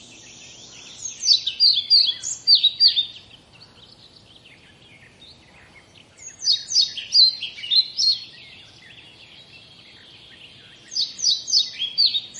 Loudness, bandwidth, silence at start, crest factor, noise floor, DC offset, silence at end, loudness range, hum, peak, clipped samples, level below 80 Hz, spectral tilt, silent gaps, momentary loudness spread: -17 LUFS; 11.5 kHz; 0.3 s; 20 dB; -50 dBFS; under 0.1%; 0 s; 10 LU; none; -4 dBFS; under 0.1%; -66 dBFS; 2 dB/octave; none; 18 LU